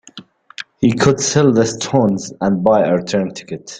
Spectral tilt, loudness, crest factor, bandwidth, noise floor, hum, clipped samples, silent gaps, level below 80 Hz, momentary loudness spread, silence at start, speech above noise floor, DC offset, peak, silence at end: -5 dB/octave; -15 LUFS; 16 dB; 9.6 kHz; -40 dBFS; none; under 0.1%; none; -50 dBFS; 11 LU; 0.15 s; 25 dB; under 0.1%; 0 dBFS; 0 s